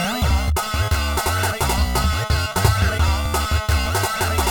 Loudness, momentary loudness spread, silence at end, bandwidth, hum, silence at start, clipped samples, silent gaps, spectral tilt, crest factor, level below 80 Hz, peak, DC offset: -20 LUFS; 2 LU; 0 s; over 20 kHz; none; 0 s; under 0.1%; none; -4 dB/octave; 18 dB; -24 dBFS; -2 dBFS; 0.1%